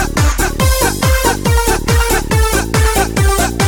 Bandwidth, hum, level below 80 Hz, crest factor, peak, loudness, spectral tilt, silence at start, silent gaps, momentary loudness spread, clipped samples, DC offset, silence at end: over 20 kHz; none; -16 dBFS; 12 dB; -2 dBFS; -13 LUFS; -4 dB/octave; 0 s; none; 1 LU; under 0.1%; under 0.1%; 0 s